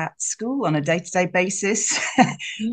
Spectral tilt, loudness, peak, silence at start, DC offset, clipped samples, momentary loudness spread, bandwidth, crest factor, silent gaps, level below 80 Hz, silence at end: -3.5 dB/octave; -21 LUFS; -2 dBFS; 0 s; under 0.1%; under 0.1%; 6 LU; 10 kHz; 20 dB; none; -66 dBFS; 0 s